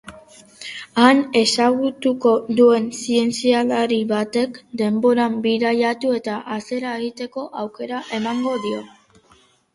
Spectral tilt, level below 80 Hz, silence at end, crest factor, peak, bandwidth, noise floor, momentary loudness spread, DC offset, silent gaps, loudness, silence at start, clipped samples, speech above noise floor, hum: -4 dB/octave; -62 dBFS; 0.85 s; 20 dB; 0 dBFS; 11.5 kHz; -55 dBFS; 14 LU; under 0.1%; none; -19 LUFS; 0.05 s; under 0.1%; 36 dB; none